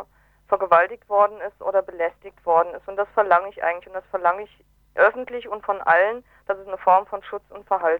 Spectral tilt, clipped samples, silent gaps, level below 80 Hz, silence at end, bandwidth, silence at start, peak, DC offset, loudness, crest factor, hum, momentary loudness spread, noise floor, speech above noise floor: -6 dB/octave; under 0.1%; none; -60 dBFS; 0 s; 4.9 kHz; 0 s; -4 dBFS; under 0.1%; -22 LUFS; 18 dB; none; 14 LU; -48 dBFS; 27 dB